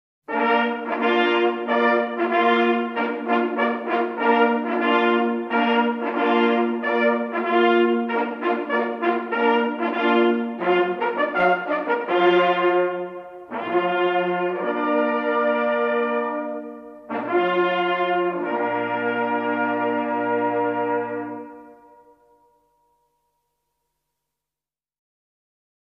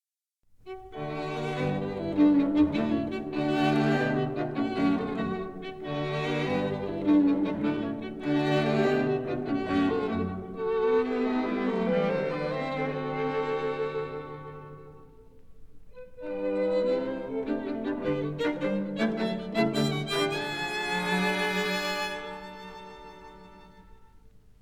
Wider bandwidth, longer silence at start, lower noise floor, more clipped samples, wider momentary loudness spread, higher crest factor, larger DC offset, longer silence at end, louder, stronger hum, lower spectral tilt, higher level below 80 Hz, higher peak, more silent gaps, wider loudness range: second, 6 kHz vs 14.5 kHz; second, 0.3 s vs 0.65 s; first, under -90 dBFS vs -72 dBFS; neither; second, 7 LU vs 14 LU; about the same, 16 dB vs 16 dB; second, under 0.1% vs 0.1%; first, 4.1 s vs 0.55 s; first, -21 LUFS vs -28 LUFS; neither; about the same, -7 dB/octave vs -6.5 dB/octave; second, -72 dBFS vs -56 dBFS; first, -6 dBFS vs -12 dBFS; neither; second, 4 LU vs 7 LU